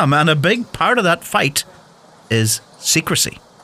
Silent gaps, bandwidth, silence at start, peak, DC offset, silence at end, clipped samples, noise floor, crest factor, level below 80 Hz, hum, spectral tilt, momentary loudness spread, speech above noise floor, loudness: none; 16 kHz; 0 s; -4 dBFS; under 0.1%; 0.25 s; under 0.1%; -46 dBFS; 14 dB; -52 dBFS; none; -3.5 dB/octave; 7 LU; 30 dB; -16 LUFS